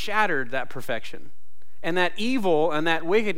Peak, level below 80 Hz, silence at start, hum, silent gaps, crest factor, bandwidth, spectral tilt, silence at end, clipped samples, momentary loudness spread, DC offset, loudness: -8 dBFS; -60 dBFS; 0 s; none; none; 18 dB; 16.5 kHz; -5 dB/octave; 0 s; under 0.1%; 10 LU; 6%; -25 LUFS